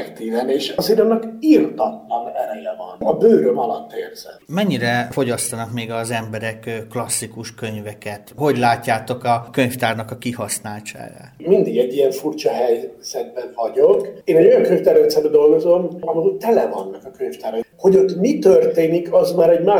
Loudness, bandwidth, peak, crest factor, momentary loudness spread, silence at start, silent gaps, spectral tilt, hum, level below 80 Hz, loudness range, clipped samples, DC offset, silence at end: -18 LUFS; 19.5 kHz; 0 dBFS; 16 dB; 15 LU; 0 s; none; -5 dB/octave; none; -58 dBFS; 7 LU; under 0.1%; under 0.1%; 0 s